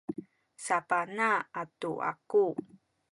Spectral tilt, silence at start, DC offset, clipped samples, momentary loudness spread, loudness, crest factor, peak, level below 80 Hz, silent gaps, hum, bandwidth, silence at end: -4.5 dB/octave; 0.1 s; under 0.1%; under 0.1%; 13 LU; -31 LUFS; 18 dB; -14 dBFS; -78 dBFS; none; none; 11 kHz; 0.5 s